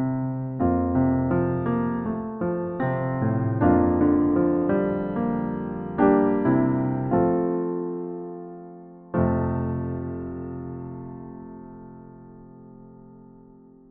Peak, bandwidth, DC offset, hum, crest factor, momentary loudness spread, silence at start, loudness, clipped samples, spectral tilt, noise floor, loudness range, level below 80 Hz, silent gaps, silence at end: -8 dBFS; 3.5 kHz; under 0.1%; none; 18 dB; 19 LU; 0 s; -24 LUFS; under 0.1%; -10.5 dB/octave; -50 dBFS; 14 LU; -46 dBFS; none; 0.65 s